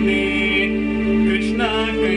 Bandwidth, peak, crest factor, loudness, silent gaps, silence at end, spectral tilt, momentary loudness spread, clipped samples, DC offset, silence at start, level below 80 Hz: 10 kHz; -8 dBFS; 10 dB; -18 LUFS; none; 0 s; -5.5 dB/octave; 2 LU; under 0.1%; under 0.1%; 0 s; -34 dBFS